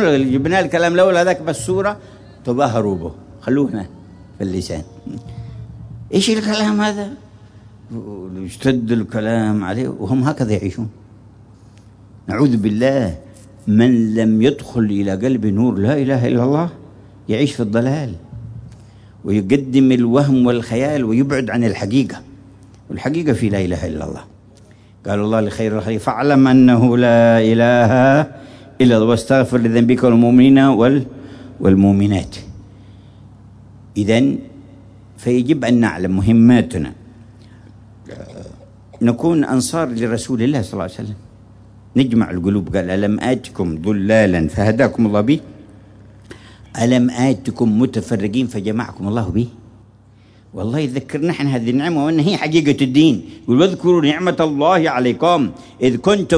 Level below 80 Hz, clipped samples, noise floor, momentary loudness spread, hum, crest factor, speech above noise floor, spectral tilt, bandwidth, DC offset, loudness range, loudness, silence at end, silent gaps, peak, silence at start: -44 dBFS; under 0.1%; -47 dBFS; 18 LU; none; 14 dB; 32 dB; -6.5 dB/octave; 11 kHz; under 0.1%; 8 LU; -16 LUFS; 0 s; none; -2 dBFS; 0 s